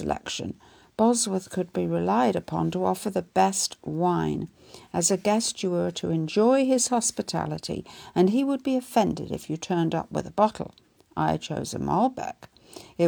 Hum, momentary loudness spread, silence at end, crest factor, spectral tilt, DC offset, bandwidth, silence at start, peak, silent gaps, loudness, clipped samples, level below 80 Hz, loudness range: none; 13 LU; 0 s; 18 dB; -4.5 dB/octave; under 0.1%; over 20 kHz; 0 s; -8 dBFS; none; -26 LUFS; under 0.1%; -58 dBFS; 3 LU